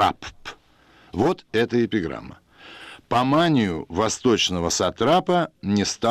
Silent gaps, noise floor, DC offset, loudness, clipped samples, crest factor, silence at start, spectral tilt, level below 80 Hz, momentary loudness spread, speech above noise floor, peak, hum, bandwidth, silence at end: none; -55 dBFS; under 0.1%; -22 LUFS; under 0.1%; 14 dB; 0 s; -4.5 dB/octave; -50 dBFS; 18 LU; 33 dB; -8 dBFS; none; 14.5 kHz; 0 s